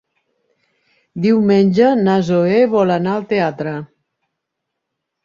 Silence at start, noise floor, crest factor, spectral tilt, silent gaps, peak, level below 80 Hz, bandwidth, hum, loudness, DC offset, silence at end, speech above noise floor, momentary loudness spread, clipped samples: 1.15 s; -77 dBFS; 14 dB; -8 dB/octave; none; -2 dBFS; -58 dBFS; 7.4 kHz; none; -15 LUFS; under 0.1%; 1.4 s; 63 dB; 12 LU; under 0.1%